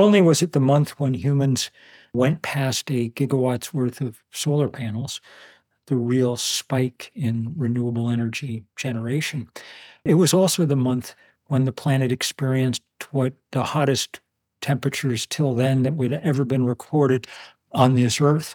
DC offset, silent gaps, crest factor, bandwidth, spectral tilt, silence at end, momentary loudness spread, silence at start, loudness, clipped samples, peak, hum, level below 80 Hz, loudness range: under 0.1%; none; 20 dB; 19.5 kHz; -5.5 dB/octave; 0 s; 12 LU; 0 s; -22 LUFS; under 0.1%; -2 dBFS; none; -66 dBFS; 4 LU